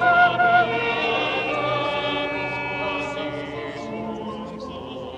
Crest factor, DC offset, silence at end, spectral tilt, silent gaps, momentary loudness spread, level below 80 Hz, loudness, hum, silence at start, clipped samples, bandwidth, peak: 18 dB; under 0.1%; 0 s; -5 dB/octave; none; 16 LU; -52 dBFS; -23 LUFS; none; 0 s; under 0.1%; 8.8 kHz; -6 dBFS